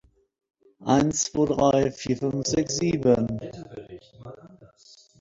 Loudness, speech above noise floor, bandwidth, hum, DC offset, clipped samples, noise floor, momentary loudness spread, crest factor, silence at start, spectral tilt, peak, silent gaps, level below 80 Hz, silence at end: -24 LUFS; 30 dB; 8 kHz; none; under 0.1%; under 0.1%; -55 dBFS; 23 LU; 20 dB; 0.8 s; -5 dB/octave; -6 dBFS; none; -52 dBFS; 0.55 s